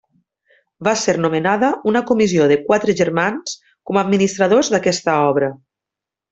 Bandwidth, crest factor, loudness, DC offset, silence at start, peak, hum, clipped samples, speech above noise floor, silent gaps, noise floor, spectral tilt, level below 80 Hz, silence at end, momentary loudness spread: 8.2 kHz; 16 dB; -17 LUFS; under 0.1%; 0.8 s; -2 dBFS; none; under 0.1%; 70 dB; none; -86 dBFS; -5 dB/octave; -58 dBFS; 0.75 s; 7 LU